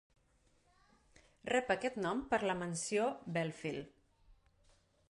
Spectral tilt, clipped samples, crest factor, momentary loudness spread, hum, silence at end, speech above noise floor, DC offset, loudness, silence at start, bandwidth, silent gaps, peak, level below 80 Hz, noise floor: -4.5 dB/octave; under 0.1%; 20 dB; 10 LU; none; 0.8 s; 36 dB; under 0.1%; -37 LUFS; 1.45 s; 11.5 kHz; none; -20 dBFS; -68 dBFS; -73 dBFS